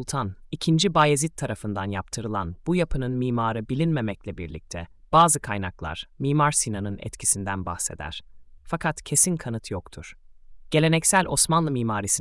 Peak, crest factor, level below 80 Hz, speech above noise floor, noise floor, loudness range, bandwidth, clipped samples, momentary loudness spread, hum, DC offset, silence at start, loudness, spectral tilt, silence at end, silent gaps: -6 dBFS; 18 dB; -46 dBFS; 20 dB; -44 dBFS; 4 LU; 12 kHz; under 0.1%; 16 LU; none; under 0.1%; 0 s; -24 LUFS; -4 dB/octave; 0 s; none